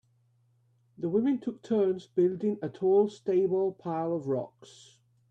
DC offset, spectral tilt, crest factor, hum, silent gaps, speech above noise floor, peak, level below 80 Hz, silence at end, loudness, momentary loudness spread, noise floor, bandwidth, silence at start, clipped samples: under 0.1%; -8.5 dB/octave; 16 dB; none; none; 40 dB; -14 dBFS; -74 dBFS; 0.65 s; -29 LUFS; 8 LU; -68 dBFS; 8.2 kHz; 1 s; under 0.1%